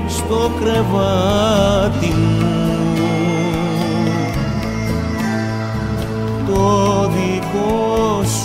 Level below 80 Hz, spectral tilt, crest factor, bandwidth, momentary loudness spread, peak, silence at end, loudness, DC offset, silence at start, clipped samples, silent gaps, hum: -32 dBFS; -6 dB/octave; 14 dB; 16 kHz; 6 LU; -2 dBFS; 0 s; -17 LUFS; under 0.1%; 0 s; under 0.1%; none; none